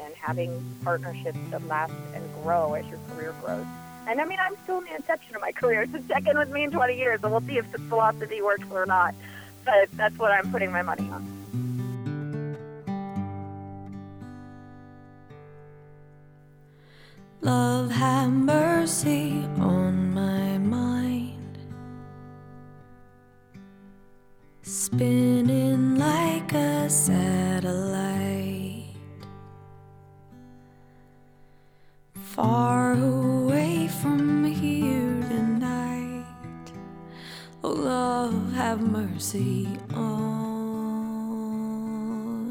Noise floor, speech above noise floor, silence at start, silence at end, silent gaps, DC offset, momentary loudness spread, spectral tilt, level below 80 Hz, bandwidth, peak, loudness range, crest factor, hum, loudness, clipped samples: -54 dBFS; 30 dB; 0 s; 0 s; none; under 0.1%; 19 LU; -5.5 dB/octave; -60 dBFS; over 20 kHz; -10 dBFS; 12 LU; 18 dB; none; -26 LUFS; under 0.1%